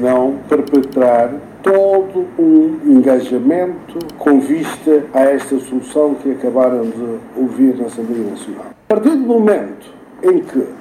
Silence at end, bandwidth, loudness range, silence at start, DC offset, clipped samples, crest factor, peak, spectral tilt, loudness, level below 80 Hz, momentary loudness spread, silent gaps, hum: 0 s; 13.5 kHz; 4 LU; 0 s; under 0.1%; under 0.1%; 14 dB; 0 dBFS; -6.5 dB/octave; -14 LUFS; -56 dBFS; 10 LU; none; none